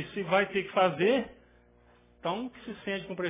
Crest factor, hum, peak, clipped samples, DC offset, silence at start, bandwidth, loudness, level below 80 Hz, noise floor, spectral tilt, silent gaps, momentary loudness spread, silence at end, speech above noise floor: 20 dB; 60 Hz at -60 dBFS; -12 dBFS; under 0.1%; under 0.1%; 0 s; 3.8 kHz; -30 LUFS; -64 dBFS; -61 dBFS; -9 dB/octave; none; 14 LU; 0 s; 32 dB